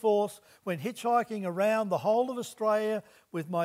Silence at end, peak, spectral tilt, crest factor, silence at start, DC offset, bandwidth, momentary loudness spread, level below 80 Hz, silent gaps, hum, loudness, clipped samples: 0 s; -14 dBFS; -5.5 dB/octave; 14 dB; 0.05 s; under 0.1%; 16 kHz; 9 LU; -82 dBFS; none; none; -30 LUFS; under 0.1%